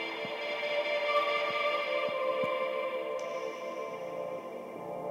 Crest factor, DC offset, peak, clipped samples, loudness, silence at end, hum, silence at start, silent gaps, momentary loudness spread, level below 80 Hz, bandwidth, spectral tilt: 18 dB; under 0.1%; -16 dBFS; under 0.1%; -33 LUFS; 0 s; none; 0 s; none; 10 LU; -82 dBFS; 16 kHz; -3.5 dB/octave